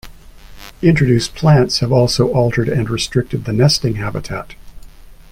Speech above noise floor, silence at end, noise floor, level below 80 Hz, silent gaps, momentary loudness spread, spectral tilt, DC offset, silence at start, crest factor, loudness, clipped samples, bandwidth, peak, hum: 23 dB; 0.2 s; -37 dBFS; -36 dBFS; none; 11 LU; -6 dB/octave; under 0.1%; 0.05 s; 16 dB; -15 LUFS; under 0.1%; 16 kHz; 0 dBFS; none